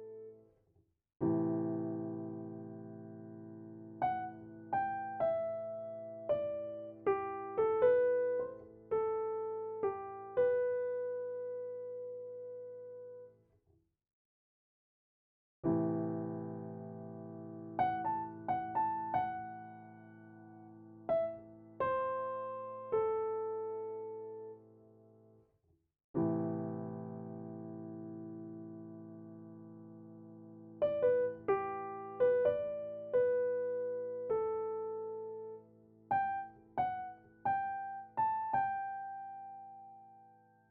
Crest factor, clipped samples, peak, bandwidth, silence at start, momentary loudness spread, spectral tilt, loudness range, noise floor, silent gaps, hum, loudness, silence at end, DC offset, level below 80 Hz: 20 dB; under 0.1%; -18 dBFS; 4 kHz; 0 s; 19 LU; -7 dB/octave; 9 LU; -76 dBFS; 14.13-15.63 s, 26.04-26.14 s; none; -37 LUFS; 0.4 s; under 0.1%; -76 dBFS